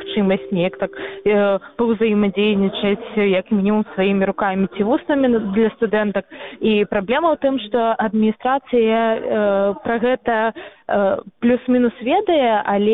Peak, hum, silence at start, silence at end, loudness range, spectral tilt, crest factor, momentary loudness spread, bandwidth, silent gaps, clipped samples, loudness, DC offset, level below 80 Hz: -4 dBFS; none; 0 s; 0 s; 1 LU; -10 dB/octave; 14 dB; 4 LU; 4 kHz; none; under 0.1%; -18 LUFS; 0.1%; -52 dBFS